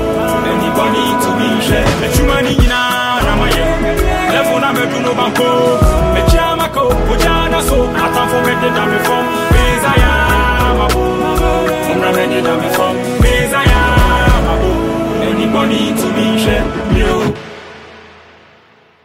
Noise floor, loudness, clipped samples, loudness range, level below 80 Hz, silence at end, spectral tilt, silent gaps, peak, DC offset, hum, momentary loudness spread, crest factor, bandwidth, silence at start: -46 dBFS; -12 LUFS; under 0.1%; 2 LU; -18 dBFS; 1.05 s; -5 dB/octave; none; 0 dBFS; under 0.1%; none; 3 LU; 12 dB; 16.5 kHz; 0 s